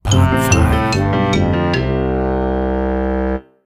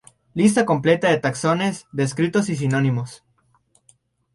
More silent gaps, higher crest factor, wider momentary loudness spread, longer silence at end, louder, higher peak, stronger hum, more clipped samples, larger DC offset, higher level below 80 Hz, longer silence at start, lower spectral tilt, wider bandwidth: neither; about the same, 16 dB vs 18 dB; about the same, 5 LU vs 7 LU; second, 0.25 s vs 1.2 s; first, -16 LUFS vs -20 LUFS; first, 0 dBFS vs -4 dBFS; neither; neither; neither; first, -24 dBFS vs -58 dBFS; second, 0.05 s vs 0.35 s; about the same, -6 dB/octave vs -6 dB/octave; first, 16 kHz vs 11.5 kHz